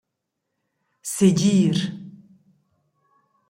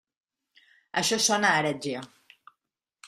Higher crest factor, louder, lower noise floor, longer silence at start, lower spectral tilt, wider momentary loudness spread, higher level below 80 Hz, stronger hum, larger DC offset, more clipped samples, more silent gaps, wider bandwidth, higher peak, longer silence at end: about the same, 20 dB vs 22 dB; first, -20 LUFS vs -25 LUFS; second, -80 dBFS vs -86 dBFS; about the same, 1.05 s vs 0.95 s; first, -6 dB/octave vs -2 dB/octave; first, 17 LU vs 13 LU; first, -62 dBFS vs -72 dBFS; neither; neither; neither; neither; about the same, 16 kHz vs 15.5 kHz; about the same, -6 dBFS vs -8 dBFS; first, 1.4 s vs 1 s